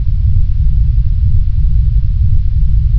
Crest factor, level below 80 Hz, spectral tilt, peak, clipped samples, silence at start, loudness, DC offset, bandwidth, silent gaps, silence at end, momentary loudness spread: 8 dB; -10 dBFS; -10.5 dB/octave; -2 dBFS; under 0.1%; 0 s; -14 LUFS; under 0.1%; 0.3 kHz; none; 0 s; 1 LU